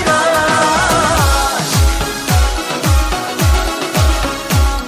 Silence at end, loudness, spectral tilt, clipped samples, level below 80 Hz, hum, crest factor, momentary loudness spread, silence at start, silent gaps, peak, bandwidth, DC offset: 0 s; -14 LUFS; -4 dB/octave; under 0.1%; -18 dBFS; none; 12 dB; 5 LU; 0 s; none; 0 dBFS; 16 kHz; under 0.1%